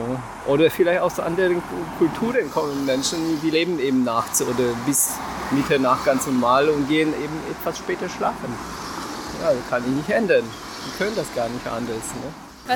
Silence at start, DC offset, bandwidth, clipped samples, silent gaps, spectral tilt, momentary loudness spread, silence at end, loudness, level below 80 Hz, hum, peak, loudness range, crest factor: 0 s; under 0.1%; 18 kHz; under 0.1%; none; -4 dB/octave; 12 LU; 0 s; -22 LUFS; -50 dBFS; none; -4 dBFS; 4 LU; 18 dB